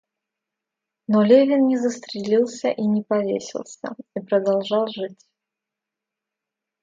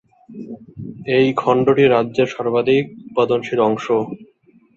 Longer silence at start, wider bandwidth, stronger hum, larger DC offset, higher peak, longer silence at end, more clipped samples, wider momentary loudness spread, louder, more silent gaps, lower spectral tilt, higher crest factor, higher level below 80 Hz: first, 1.1 s vs 0.3 s; about the same, 7.8 kHz vs 7.4 kHz; neither; neither; about the same, -2 dBFS vs -2 dBFS; first, 1.7 s vs 0.5 s; neither; about the same, 18 LU vs 20 LU; second, -20 LUFS vs -17 LUFS; neither; about the same, -6 dB/octave vs -7 dB/octave; about the same, 20 dB vs 16 dB; second, -74 dBFS vs -58 dBFS